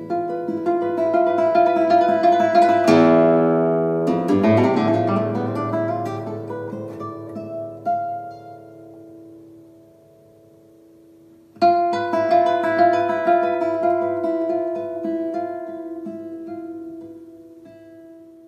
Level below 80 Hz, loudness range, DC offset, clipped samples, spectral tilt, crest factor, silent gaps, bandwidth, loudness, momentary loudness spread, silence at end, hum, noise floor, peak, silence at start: -68 dBFS; 15 LU; under 0.1%; under 0.1%; -7.5 dB/octave; 20 dB; none; 9.6 kHz; -19 LUFS; 17 LU; 0.25 s; none; -50 dBFS; 0 dBFS; 0 s